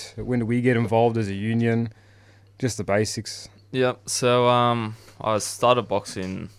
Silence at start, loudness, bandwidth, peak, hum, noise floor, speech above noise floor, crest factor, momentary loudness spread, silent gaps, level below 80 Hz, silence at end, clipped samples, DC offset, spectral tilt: 0 s; -23 LUFS; 15 kHz; -4 dBFS; none; -52 dBFS; 30 dB; 20 dB; 12 LU; none; -56 dBFS; 0.1 s; under 0.1%; under 0.1%; -5 dB/octave